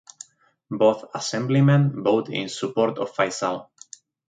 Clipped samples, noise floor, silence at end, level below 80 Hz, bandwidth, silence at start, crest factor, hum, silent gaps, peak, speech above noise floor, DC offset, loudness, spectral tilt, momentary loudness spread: under 0.1%; -48 dBFS; 0.65 s; -68 dBFS; 9.2 kHz; 0.7 s; 18 dB; none; none; -6 dBFS; 26 dB; under 0.1%; -22 LUFS; -6 dB/octave; 24 LU